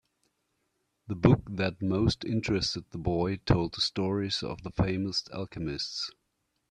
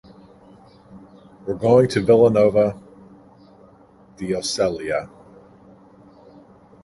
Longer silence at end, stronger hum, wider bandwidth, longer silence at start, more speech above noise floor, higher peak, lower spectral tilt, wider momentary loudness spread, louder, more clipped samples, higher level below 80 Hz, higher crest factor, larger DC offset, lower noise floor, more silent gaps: second, 0.6 s vs 1.8 s; neither; about the same, 10.5 kHz vs 11.5 kHz; first, 1.1 s vs 0.95 s; first, 49 dB vs 33 dB; second, -6 dBFS vs -2 dBFS; about the same, -6 dB/octave vs -6 dB/octave; second, 10 LU vs 19 LU; second, -30 LUFS vs -18 LUFS; neither; first, -48 dBFS vs -54 dBFS; about the same, 24 dB vs 20 dB; neither; first, -78 dBFS vs -50 dBFS; neither